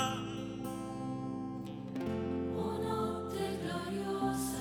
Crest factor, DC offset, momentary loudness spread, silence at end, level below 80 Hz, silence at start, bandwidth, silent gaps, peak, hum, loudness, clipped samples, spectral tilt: 18 dB; under 0.1%; 6 LU; 0 s; -60 dBFS; 0 s; 20 kHz; none; -20 dBFS; none; -38 LUFS; under 0.1%; -5.5 dB/octave